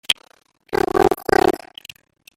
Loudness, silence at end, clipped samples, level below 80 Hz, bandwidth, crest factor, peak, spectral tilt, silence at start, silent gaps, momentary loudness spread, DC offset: -19 LUFS; 0.8 s; under 0.1%; -44 dBFS; 16.5 kHz; 20 dB; -2 dBFS; -4 dB/octave; 0.1 s; none; 17 LU; under 0.1%